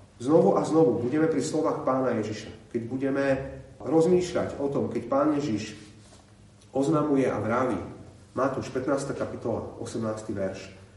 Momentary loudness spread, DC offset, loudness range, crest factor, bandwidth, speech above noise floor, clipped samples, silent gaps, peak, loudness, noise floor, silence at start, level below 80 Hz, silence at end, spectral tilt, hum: 13 LU; under 0.1%; 4 LU; 18 dB; 11.5 kHz; 27 dB; under 0.1%; none; -8 dBFS; -27 LUFS; -53 dBFS; 0 s; -58 dBFS; 0.1 s; -6.5 dB/octave; none